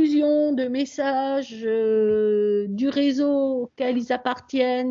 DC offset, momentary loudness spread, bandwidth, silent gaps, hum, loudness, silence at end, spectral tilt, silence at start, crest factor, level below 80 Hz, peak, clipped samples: under 0.1%; 6 LU; 7.6 kHz; none; none; -23 LUFS; 0 s; -6 dB/octave; 0 s; 14 dB; -66 dBFS; -8 dBFS; under 0.1%